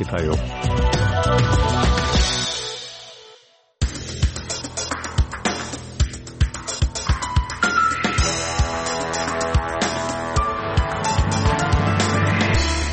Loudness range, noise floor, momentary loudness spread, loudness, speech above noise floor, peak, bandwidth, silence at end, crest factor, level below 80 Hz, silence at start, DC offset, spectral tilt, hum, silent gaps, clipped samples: 5 LU; -52 dBFS; 8 LU; -21 LUFS; 33 dB; -6 dBFS; 8.8 kHz; 0 s; 14 dB; -26 dBFS; 0 s; under 0.1%; -4.5 dB/octave; none; none; under 0.1%